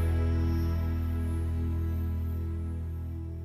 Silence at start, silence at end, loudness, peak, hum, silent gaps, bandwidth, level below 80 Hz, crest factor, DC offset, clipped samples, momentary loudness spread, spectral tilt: 0 s; 0 s; -32 LUFS; -20 dBFS; none; none; 14.5 kHz; -34 dBFS; 10 dB; under 0.1%; under 0.1%; 8 LU; -9 dB/octave